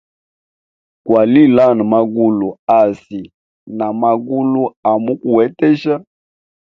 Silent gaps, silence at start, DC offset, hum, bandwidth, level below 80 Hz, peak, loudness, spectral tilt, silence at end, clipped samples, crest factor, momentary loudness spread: 2.59-2.67 s, 3.34-3.66 s, 4.76-4.83 s; 1.05 s; under 0.1%; none; 6 kHz; -58 dBFS; 0 dBFS; -14 LUFS; -9 dB/octave; 0.6 s; under 0.1%; 14 dB; 13 LU